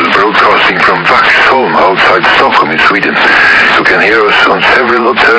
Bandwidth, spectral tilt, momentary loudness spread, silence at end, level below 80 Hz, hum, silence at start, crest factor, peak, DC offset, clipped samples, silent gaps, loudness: 8 kHz; -4 dB/octave; 3 LU; 0 s; -40 dBFS; none; 0 s; 6 dB; 0 dBFS; under 0.1%; 3%; none; -5 LUFS